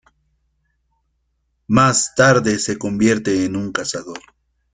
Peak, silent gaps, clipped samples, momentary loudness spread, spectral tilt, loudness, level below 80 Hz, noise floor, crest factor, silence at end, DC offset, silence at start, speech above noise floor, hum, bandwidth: -2 dBFS; none; under 0.1%; 13 LU; -4.5 dB/octave; -17 LUFS; -52 dBFS; -69 dBFS; 18 dB; 0.55 s; under 0.1%; 1.7 s; 52 dB; none; 9.6 kHz